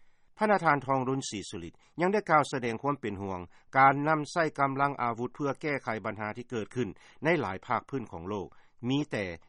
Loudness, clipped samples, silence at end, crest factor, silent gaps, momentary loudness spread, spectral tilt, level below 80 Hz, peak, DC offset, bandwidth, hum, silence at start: -30 LUFS; under 0.1%; 0.1 s; 22 dB; none; 13 LU; -5.5 dB/octave; -64 dBFS; -10 dBFS; under 0.1%; 11 kHz; none; 0 s